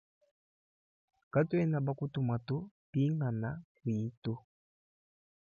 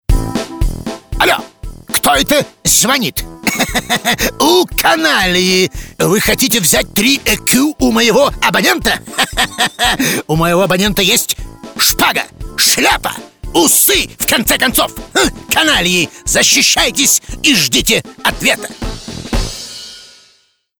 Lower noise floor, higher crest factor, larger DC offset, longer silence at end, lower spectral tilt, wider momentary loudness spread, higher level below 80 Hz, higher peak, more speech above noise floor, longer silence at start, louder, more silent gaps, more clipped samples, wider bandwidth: first, under -90 dBFS vs -54 dBFS; about the same, 18 dB vs 14 dB; neither; first, 1.15 s vs 0.75 s; first, -9.5 dB/octave vs -2 dB/octave; about the same, 10 LU vs 12 LU; second, -68 dBFS vs -28 dBFS; second, -18 dBFS vs 0 dBFS; first, over 57 dB vs 42 dB; first, 1.35 s vs 0.1 s; second, -35 LUFS vs -11 LUFS; first, 2.71-2.93 s, 3.64-3.75 s, 4.17-4.22 s vs none; neither; second, 6.8 kHz vs over 20 kHz